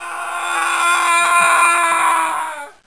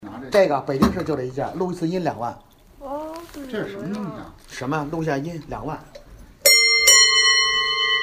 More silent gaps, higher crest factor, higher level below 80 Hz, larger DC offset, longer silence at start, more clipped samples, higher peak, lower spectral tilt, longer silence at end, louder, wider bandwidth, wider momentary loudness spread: neither; about the same, 16 dB vs 20 dB; second, -68 dBFS vs -46 dBFS; first, 0.3% vs under 0.1%; about the same, 0 s vs 0 s; neither; about the same, 0 dBFS vs 0 dBFS; second, 1 dB/octave vs -2 dB/octave; first, 0.15 s vs 0 s; first, -14 LUFS vs -17 LUFS; second, 11 kHz vs 15.5 kHz; second, 11 LU vs 21 LU